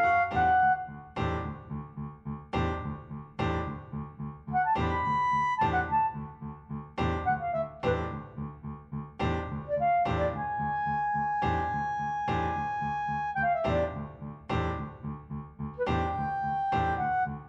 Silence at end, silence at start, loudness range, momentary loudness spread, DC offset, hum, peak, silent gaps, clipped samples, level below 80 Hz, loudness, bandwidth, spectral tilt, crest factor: 0 s; 0 s; 4 LU; 14 LU; under 0.1%; none; -14 dBFS; none; under 0.1%; -46 dBFS; -30 LUFS; 8 kHz; -7.5 dB/octave; 16 dB